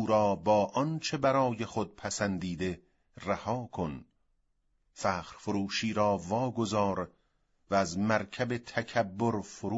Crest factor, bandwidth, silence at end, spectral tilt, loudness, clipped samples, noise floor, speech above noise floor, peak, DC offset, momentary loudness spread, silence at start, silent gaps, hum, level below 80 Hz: 20 dB; 8 kHz; 0 s; -5.5 dB/octave; -31 LUFS; under 0.1%; -74 dBFS; 43 dB; -12 dBFS; under 0.1%; 9 LU; 0 s; none; none; -62 dBFS